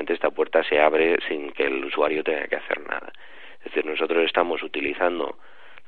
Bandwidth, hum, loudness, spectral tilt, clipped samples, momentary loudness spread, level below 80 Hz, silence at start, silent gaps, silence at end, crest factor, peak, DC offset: 4.5 kHz; none; -24 LUFS; -6.5 dB/octave; under 0.1%; 13 LU; -62 dBFS; 0 s; none; 0.55 s; 22 dB; -2 dBFS; 1%